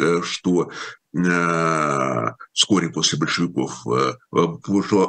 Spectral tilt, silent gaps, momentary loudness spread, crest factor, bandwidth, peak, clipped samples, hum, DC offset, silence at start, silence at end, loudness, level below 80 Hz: -4 dB/octave; none; 7 LU; 20 dB; 10 kHz; -2 dBFS; under 0.1%; none; under 0.1%; 0 s; 0 s; -21 LUFS; -62 dBFS